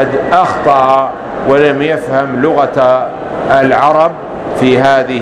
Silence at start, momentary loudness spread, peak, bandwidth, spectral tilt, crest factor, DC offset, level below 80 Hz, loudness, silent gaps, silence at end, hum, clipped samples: 0 s; 9 LU; 0 dBFS; 11 kHz; -6.5 dB/octave; 10 dB; under 0.1%; -42 dBFS; -10 LUFS; none; 0 s; none; 0.4%